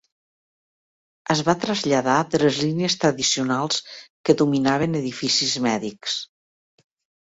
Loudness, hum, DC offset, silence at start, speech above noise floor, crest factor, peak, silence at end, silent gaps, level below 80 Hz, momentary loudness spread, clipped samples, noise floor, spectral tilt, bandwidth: -21 LUFS; none; under 0.1%; 1.3 s; over 69 dB; 20 dB; -2 dBFS; 0.95 s; 4.10-4.24 s; -60 dBFS; 8 LU; under 0.1%; under -90 dBFS; -4 dB/octave; 8 kHz